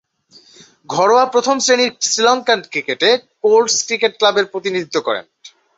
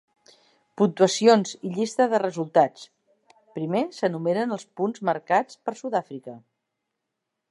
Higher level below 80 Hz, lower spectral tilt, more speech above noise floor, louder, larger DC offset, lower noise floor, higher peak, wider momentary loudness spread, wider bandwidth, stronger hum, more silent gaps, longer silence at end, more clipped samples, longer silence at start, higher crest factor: first, -66 dBFS vs -80 dBFS; second, -1.5 dB/octave vs -5 dB/octave; second, 34 dB vs 59 dB; first, -15 LUFS vs -24 LUFS; neither; second, -49 dBFS vs -82 dBFS; about the same, -2 dBFS vs -4 dBFS; second, 8 LU vs 14 LU; second, 8 kHz vs 11.5 kHz; neither; neither; second, 0.3 s vs 1.15 s; neither; about the same, 0.9 s vs 0.8 s; second, 16 dB vs 22 dB